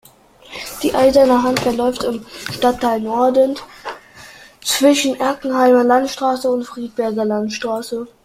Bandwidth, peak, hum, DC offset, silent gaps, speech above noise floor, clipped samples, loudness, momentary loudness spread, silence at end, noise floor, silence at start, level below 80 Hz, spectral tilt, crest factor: 16 kHz; -2 dBFS; none; under 0.1%; none; 29 dB; under 0.1%; -16 LUFS; 15 LU; 0.2 s; -45 dBFS; 0.5 s; -50 dBFS; -3.5 dB/octave; 16 dB